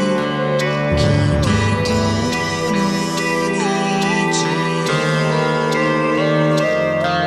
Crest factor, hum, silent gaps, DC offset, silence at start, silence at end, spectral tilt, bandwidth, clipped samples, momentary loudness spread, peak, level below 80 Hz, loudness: 12 dB; none; none; under 0.1%; 0 s; 0 s; -5.5 dB/octave; 13.5 kHz; under 0.1%; 3 LU; -4 dBFS; -36 dBFS; -17 LUFS